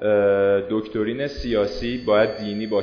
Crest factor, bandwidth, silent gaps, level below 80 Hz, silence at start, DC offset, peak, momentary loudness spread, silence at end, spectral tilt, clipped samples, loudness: 14 dB; 5.4 kHz; none; -42 dBFS; 0 s; under 0.1%; -6 dBFS; 8 LU; 0 s; -7 dB/octave; under 0.1%; -22 LUFS